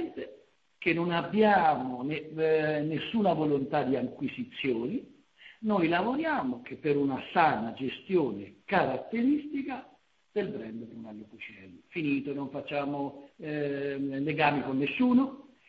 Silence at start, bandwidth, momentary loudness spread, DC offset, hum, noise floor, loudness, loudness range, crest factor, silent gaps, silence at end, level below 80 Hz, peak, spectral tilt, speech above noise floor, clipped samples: 0 s; 5.2 kHz; 14 LU; under 0.1%; none; -59 dBFS; -30 LUFS; 8 LU; 20 dB; none; 0.25 s; -66 dBFS; -10 dBFS; -9 dB/octave; 29 dB; under 0.1%